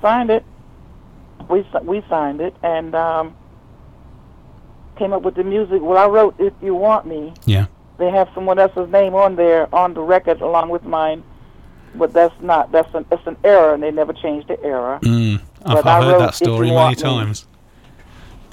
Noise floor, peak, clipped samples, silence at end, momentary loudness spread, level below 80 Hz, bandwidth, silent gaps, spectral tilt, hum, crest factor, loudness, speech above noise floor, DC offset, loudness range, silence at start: -45 dBFS; 0 dBFS; under 0.1%; 0.15 s; 10 LU; -44 dBFS; 15 kHz; none; -7 dB/octave; none; 16 dB; -16 LUFS; 29 dB; under 0.1%; 6 LU; 0 s